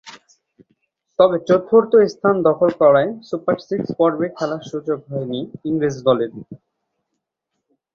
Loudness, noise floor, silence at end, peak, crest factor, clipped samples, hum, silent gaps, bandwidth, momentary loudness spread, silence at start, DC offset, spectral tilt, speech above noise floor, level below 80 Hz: -18 LUFS; -78 dBFS; 1.4 s; -2 dBFS; 18 dB; under 0.1%; none; none; 7.2 kHz; 12 LU; 0.05 s; under 0.1%; -7 dB/octave; 60 dB; -60 dBFS